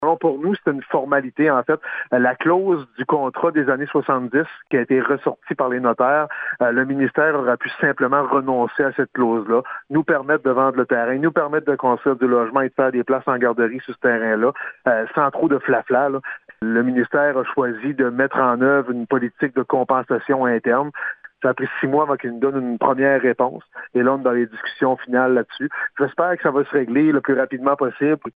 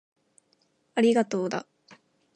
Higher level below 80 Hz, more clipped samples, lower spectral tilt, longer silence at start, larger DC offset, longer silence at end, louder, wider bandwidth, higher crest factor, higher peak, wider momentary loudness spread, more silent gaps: first, -68 dBFS vs -82 dBFS; neither; first, -10 dB/octave vs -5.5 dB/octave; second, 0 s vs 0.95 s; neither; second, 0.05 s vs 0.4 s; first, -19 LUFS vs -26 LUFS; second, 4.8 kHz vs 10 kHz; about the same, 18 dB vs 16 dB; first, -2 dBFS vs -12 dBFS; second, 5 LU vs 11 LU; neither